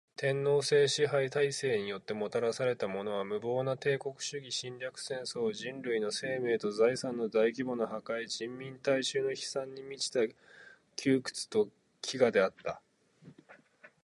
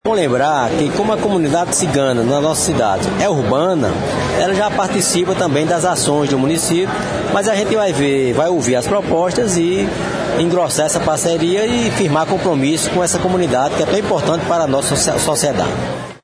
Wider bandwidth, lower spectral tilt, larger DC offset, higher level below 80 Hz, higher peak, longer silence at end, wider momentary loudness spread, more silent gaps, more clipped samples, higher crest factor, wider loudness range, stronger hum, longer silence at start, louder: about the same, 11.5 kHz vs 11 kHz; about the same, -4 dB/octave vs -4.5 dB/octave; neither; second, -76 dBFS vs -42 dBFS; second, -14 dBFS vs -2 dBFS; about the same, 0.15 s vs 0.05 s; first, 11 LU vs 3 LU; neither; neither; first, 20 dB vs 14 dB; first, 4 LU vs 0 LU; neither; first, 0.2 s vs 0.05 s; second, -33 LUFS vs -15 LUFS